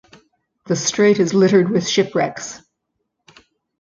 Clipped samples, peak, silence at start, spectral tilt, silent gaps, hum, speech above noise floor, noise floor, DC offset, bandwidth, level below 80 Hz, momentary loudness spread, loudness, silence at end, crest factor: under 0.1%; -2 dBFS; 0.65 s; -4.5 dB/octave; none; none; 59 dB; -75 dBFS; under 0.1%; 7.6 kHz; -60 dBFS; 10 LU; -17 LUFS; 1.25 s; 16 dB